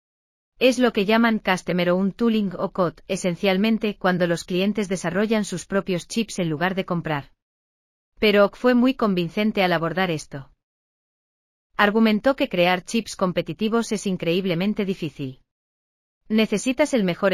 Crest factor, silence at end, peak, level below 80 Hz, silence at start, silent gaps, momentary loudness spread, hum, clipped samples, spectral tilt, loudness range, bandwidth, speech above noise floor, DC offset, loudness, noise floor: 20 dB; 0 s; -4 dBFS; -54 dBFS; 0.6 s; 7.42-8.12 s, 10.63-11.70 s, 15.51-16.21 s; 8 LU; none; under 0.1%; -5.5 dB/octave; 4 LU; 15 kHz; over 69 dB; under 0.1%; -22 LUFS; under -90 dBFS